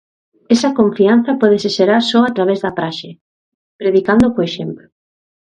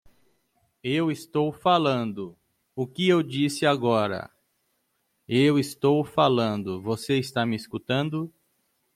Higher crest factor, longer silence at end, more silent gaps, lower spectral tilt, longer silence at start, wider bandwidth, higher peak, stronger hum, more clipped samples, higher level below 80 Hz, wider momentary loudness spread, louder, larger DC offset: second, 14 dB vs 20 dB; about the same, 0.7 s vs 0.65 s; first, 3.21-3.79 s vs none; about the same, -5.5 dB/octave vs -6 dB/octave; second, 0.5 s vs 0.85 s; second, 9.6 kHz vs 15.5 kHz; first, 0 dBFS vs -6 dBFS; neither; neither; first, -48 dBFS vs -66 dBFS; about the same, 13 LU vs 12 LU; first, -14 LUFS vs -25 LUFS; neither